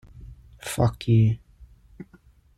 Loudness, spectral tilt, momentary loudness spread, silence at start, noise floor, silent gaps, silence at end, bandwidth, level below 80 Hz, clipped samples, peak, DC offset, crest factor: -23 LUFS; -7 dB/octave; 24 LU; 0.2 s; -56 dBFS; none; 0.55 s; 13.5 kHz; -46 dBFS; under 0.1%; -8 dBFS; under 0.1%; 18 dB